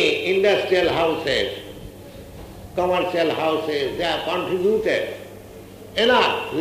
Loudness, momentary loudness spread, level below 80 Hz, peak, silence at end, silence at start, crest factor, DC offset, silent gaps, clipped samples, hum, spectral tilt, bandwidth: -21 LUFS; 22 LU; -50 dBFS; -4 dBFS; 0 s; 0 s; 18 dB; under 0.1%; none; under 0.1%; none; -4.5 dB/octave; 15.5 kHz